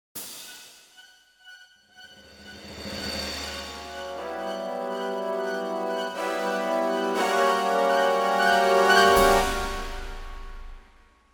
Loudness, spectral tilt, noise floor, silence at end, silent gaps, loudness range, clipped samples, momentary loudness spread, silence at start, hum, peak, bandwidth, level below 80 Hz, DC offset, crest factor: -24 LUFS; -3 dB/octave; -56 dBFS; 0.55 s; none; 15 LU; under 0.1%; 22 LU; 0.15 s; none; -4 dBFS; 19 kHz; -42 dBFS; under 0.1%; 22 dB